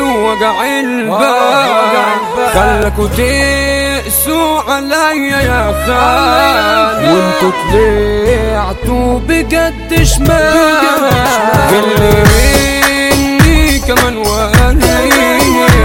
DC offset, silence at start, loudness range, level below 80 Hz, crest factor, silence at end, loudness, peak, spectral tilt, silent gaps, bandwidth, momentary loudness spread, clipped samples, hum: under 0.1%; 0 s; 3 LU; -18 dBFS; 10 dB; 0 s; -9 LUFS; 0 dBFS; -4.5 dB/octave; none; 17.5 kHz; 5 LU; 0.5%; none